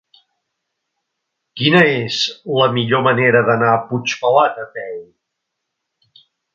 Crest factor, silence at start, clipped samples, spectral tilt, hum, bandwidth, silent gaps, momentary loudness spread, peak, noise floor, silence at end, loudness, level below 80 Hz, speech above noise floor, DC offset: 18 dB; 1.55 s; under 0.1%; -5 dB/octave; none; 7.8 kHz; none; 16 LU; 0 dBFS; -77 dBFS; 1.5 s; -15 LUFS; -62 dBFS; 62 dB; under 0.1%